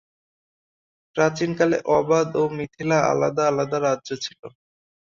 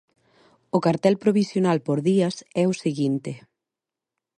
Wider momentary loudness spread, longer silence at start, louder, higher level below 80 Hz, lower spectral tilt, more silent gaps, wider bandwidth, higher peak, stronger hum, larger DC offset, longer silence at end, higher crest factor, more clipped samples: first, 10 LU vs 7 LU; first, 1.15 s vs 0.75 s; about the same, -22 LUFS vs -23 LUFS; about the same, -62 dBFS vs -66 dBFS; second, -5.5 dB/octave vs -7 dB/octave; first, 4.39-4.43 s vs none; second, 7.4 kHz vs 11 kHz; about the same, -6 dBFS vs -6 dBFS; neither; neither; second, 0.65 s vs 1 s; about the same, 18 dB vs 18 dB; neither